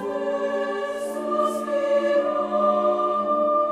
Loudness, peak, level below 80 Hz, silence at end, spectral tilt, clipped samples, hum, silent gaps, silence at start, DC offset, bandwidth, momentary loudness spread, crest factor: -23 LUFS; -10 dBFS; -66 dBFS; 0 s; -5 dB/octave; under 0.1%; none; none; 0 s; under 0.1%; 13.5 kHz; 6 LU; 14 dB